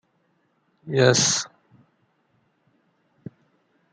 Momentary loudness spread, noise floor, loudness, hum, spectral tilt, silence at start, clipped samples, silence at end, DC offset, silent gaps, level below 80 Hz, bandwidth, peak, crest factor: 28 LU; -68 dBFS; -20 LUFS; none; -3 dB/octave; 0.85 s; under 0.1%; 2.45 s; under 0.1%; none; -66 dBFS; 10 kHz; -4 dBFS; 24 dB